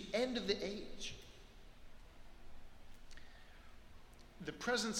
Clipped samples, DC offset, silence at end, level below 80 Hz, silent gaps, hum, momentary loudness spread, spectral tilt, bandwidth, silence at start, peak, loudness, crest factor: under 0.1%; under 0.1%; 0 s; -58 dBFS; none; none; 25 LU; -3 dB/octave; 16 kHz; 0 s; -24 dBFS; -41 LUFS; 20 dB